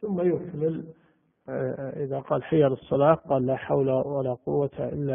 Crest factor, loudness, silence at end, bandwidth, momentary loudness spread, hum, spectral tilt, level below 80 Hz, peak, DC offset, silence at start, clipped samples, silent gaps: 20 dB; -26 LUFS; 0 s; 3.7 kHz; 10 LU; none; -8 dB/octave; -60 dBFS; -6 dBFS; under 0.1%; 0 s; under 0.1%; none